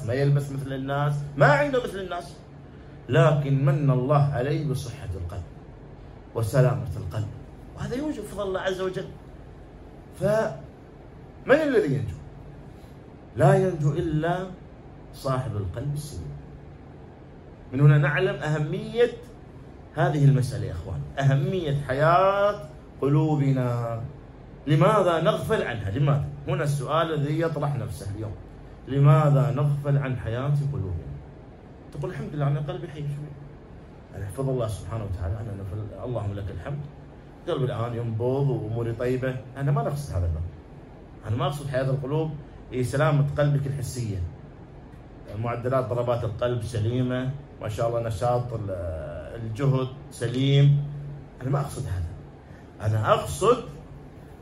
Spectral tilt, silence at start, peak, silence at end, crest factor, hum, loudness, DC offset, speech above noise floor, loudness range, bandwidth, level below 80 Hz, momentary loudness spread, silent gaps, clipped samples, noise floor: -7.5 dB/octave; 0 s; -4 dBFS; 0 s; 20 dB; none; -25 LUFS; under 0.1%; 21 dB; 8 LU; 12.5 kHz; -46 dBFS; 24 LU; none; under 0.1%; -45 dBFS